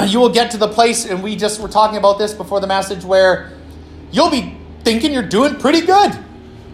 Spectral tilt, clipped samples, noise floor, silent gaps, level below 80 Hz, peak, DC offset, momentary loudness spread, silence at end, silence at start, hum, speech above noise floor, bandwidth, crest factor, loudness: -4 dB/octave; under 0.1%; -35 dBFS; none; -44 dBFS; 0 dBFS; under 0.1%; 9 LU; 0 s; 0 s; none; 21 dB; 15 kHz; 14 dB; -15 LUFS